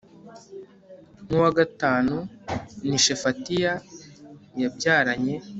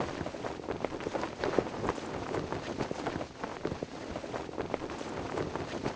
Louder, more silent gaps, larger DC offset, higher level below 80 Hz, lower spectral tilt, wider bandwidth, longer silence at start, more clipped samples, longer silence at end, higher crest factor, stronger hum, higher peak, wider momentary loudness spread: first, -24 LUFS vs -37 LUFS; neither; neither; about the same, -56 dBFS vs -54 dBFS; second, -3.5 dB/octave vs -5.5 dB/octave; about the same, 8.2 kHz vs 8 kHz; first, 0.25 s vs 0 s; neither; about the same, 0 s vs 0 s; second, 20 dB vs 26 dB; neither; first, -6 dBFS vs -10 dBFS; first, 23 LU vs 7 LU